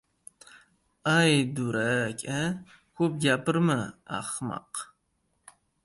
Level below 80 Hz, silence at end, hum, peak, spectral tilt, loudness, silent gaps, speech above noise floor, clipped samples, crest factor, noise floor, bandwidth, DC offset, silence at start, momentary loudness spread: -64 dBFS; 1 s; none; -10 dBFS; -5 dB/octave; -27 LUFS; none; 47 dB; under 0.1%; 18 dB; -74 dBFS; 11.5 kHz; under 0.1%; 0.55 s; 13 LU